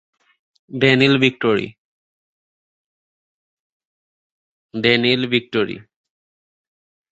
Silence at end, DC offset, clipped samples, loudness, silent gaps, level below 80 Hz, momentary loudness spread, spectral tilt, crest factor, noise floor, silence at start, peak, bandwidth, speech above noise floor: 1.3 s; under 0.1%; under 0.1%; -17 LUFS; 1.78-4.69 s; -60 dBFS; 19 LU; -6 dB/octave; 22 dB; under -90 dBFS; 0.7 s; -2 dBFS; 8 kHz; over 73 dB